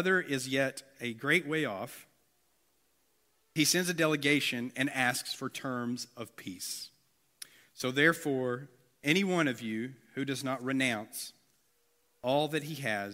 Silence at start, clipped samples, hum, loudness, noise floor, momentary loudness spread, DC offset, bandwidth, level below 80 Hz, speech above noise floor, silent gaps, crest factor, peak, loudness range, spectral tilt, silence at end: 0 s; under 0.1%; none; -31 LUFS; -74 dBFS; 15 LU; under 0.1%; 16 kHz; -78 dBFS; 42 dB; none; 22 dB; -10 dBFS; 4 LU; -3.5 dB/octave; 0 s